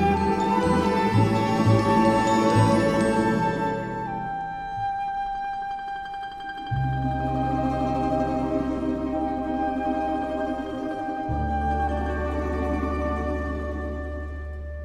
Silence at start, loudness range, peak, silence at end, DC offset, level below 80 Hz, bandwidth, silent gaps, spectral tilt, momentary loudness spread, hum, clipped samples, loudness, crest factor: 0 s; 8 LU; -8 dBFS; 0 s; under 0.1%; -36 dBFS; 13 kHz; none; -7 dB/octave; 11 LU; none; under 0.1%; -25 LUFS; 18 dB